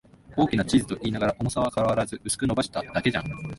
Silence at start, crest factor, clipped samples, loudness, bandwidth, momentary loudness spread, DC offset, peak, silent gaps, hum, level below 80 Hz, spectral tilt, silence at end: 0.3 s; 18 dB; under 0.1%; -26 LUFS; 12 kHz; 5 LU; under 0.1%; -8 dBFS; none; none; -48 dBFS; -5 dB/octave; 0 s